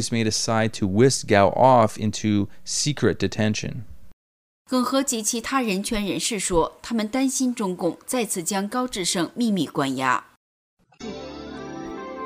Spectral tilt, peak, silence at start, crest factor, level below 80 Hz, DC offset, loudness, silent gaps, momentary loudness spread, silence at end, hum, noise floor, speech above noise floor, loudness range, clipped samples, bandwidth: -4 dB/octave; -2 dBFS; 0 s; 20 dB; -48 dBFS; under 0.1%; -22 LUFS; 4.13-4.65 s, 10.37-10.77 s; 16 LU; 0 s; none; under -90 dBFS; over 68 dB; 5 LU; under 0.1%; 16 kHz